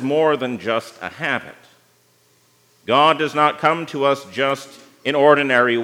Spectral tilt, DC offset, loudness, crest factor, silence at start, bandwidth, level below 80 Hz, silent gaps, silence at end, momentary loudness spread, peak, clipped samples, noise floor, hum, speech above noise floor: -5 dB/octave; under 0.1%; -18 LUFS; 18 dB; 0 s; 15.5 kHz; -74 dBFS; none; 0 s; 11 LU; 0 dBFS; under 0.1%; -58 dBFS; 60 Hz at -60 dBFS; 40 dB